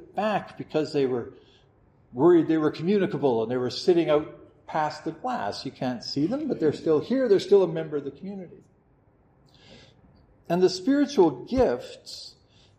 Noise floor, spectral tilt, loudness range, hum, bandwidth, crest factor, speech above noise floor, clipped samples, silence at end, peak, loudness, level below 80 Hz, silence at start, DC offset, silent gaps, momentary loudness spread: -61 dBFS; -6.5 dB/octave; 4 LU; none; 9.4 kHz; 18 dB; 37 dB; under 0.1%; 0.5 s; -8 dBFS; -25 LUFS; -58 dBFS; 0 s; under 0.1%; none; 18 LU